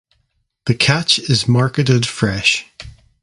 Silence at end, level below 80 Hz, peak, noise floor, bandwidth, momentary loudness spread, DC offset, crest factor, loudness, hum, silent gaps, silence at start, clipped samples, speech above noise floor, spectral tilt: 0.35 s; -44 dBFS; 0 dBFS; -66 dBFS; 11.5 kHz; 8 LU; under 0.1%; 18 dB; -15 LUFS; none; none; 0.65 s; under 0.1%; 51 dB; -4.5 dB/octave